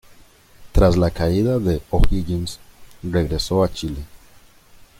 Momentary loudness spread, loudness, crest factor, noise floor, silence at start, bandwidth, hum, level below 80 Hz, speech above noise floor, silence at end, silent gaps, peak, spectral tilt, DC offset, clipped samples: 16 LU; -21 LUFS; 18 dB; -48 dBFS; 0.6 s; 16 kHz; none; -26 dBFS; 30 dB; 0.85 s; none; -2 dBFS; -7 dB/octave; under 0.1%; under 0.1%